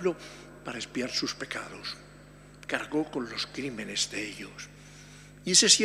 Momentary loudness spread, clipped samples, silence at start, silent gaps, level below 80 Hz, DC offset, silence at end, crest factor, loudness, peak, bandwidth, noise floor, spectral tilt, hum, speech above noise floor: 19 LU; under 0.1%; 0 s; none; -60 dBFS; under 0.1%; 0 s; 26 dB; -29 LUFS; -6 dBFS; 15.5 kHz; -51 dBFS; -1.5 dB/octave; 50 Hz at -55 dBFS; 21 dB